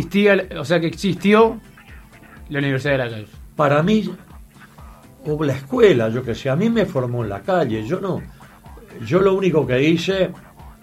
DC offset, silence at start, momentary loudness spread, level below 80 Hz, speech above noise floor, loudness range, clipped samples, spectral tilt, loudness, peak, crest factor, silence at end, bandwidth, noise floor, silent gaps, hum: under 0.1%; 0 s; 14 LU; -46 dBFS; 25 dB; 3 LU; under 0.1%; -7 dB/octave; -19 LUFS; -2 dBFS; 18 dB; 0.1 s; 15.5 kHz; -43 dBFS; none; none